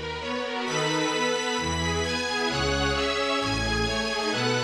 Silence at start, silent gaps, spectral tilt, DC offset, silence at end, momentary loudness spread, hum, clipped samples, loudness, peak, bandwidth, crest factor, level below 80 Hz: 0 s; none; -3.5 dB/octave; under 0.1%; 0 s; 3 LU; none; under 0.1%; -26 LUFS; -14 dBFS; 14.5 kHz; 14 dB; -40 dBFS